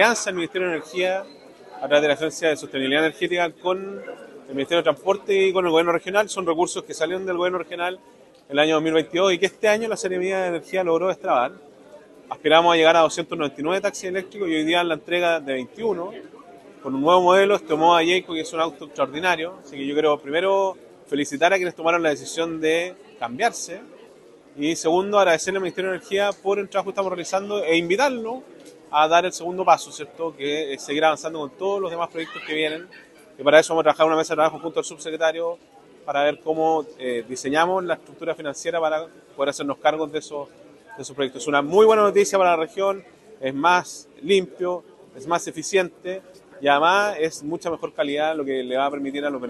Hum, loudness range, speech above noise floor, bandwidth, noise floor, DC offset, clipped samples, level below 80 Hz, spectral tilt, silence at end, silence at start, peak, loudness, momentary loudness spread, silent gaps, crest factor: none; 4 LU; 27 dB; 12.5 kHz; -49 dBFS; under 0.1%; under 0.1%; -68 dBFS; -3.5 dB/octave; 0 s; 0 s; -2 dBFS; -22 LUFS; 13 LU; none; 22 dB